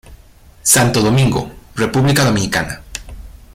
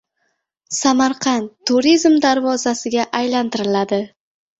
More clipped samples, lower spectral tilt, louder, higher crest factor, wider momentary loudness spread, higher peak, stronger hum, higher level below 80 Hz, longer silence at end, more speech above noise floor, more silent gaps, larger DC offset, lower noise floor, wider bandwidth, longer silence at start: neither; about the same, -4 dB/octave vs -3 dB/octave; first, -14 LUFS vs -17 LUFS; about the same, 16 dB vs 16 dB; first, 17 LU vs 8 LU; about the same, 0 dBFS vs -2 dBFS; neither; first, -36 dBFS vs -60 dBFS; second, 0.2 s vs 0.5 s; second, 30 dB vs 53 dB; neither; neither; second, -43 dBFS vs -70 dBFS; first, 16.5 kHz vs 8.2 kHz; second, 0.1 s vs 0.7 s